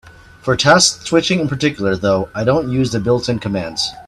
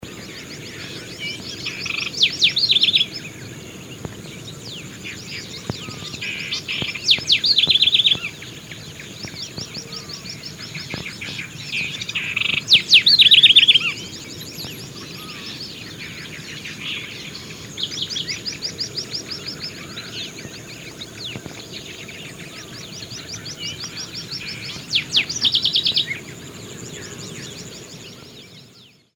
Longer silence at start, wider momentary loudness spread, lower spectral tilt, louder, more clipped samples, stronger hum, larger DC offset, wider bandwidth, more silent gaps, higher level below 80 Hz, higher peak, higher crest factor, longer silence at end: about the same, 0.05 s vs 0 s; second, 9 LU vs 21 LU; first, -4 dB/octave vs -1.5 dB/octave; about the same, -16 LUFS vs -17 LUFS; neither; neither; neither; second, 13 kHz vs over 20 kHz; neither; first, -44 dBFS vs -56 dBFS; about the same, 0 dBFS vs -2 dBFS; second, 16 dB vs 22 dB; second, 0.05 s vs 0.3 s